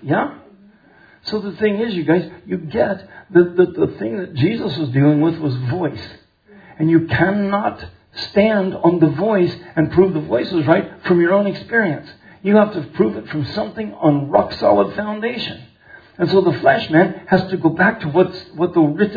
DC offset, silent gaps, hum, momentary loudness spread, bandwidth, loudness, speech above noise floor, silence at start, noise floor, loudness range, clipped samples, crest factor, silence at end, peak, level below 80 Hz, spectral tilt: under 0.1%; none; none; 10 LU; 5 kHz; -17 LUFS; 32 dB; 0 s; -49 dBFS; 3 LU; under 0.1%; 18 dB; 0 s; 0 dBFS; -52 dBFS; -9 dB/octave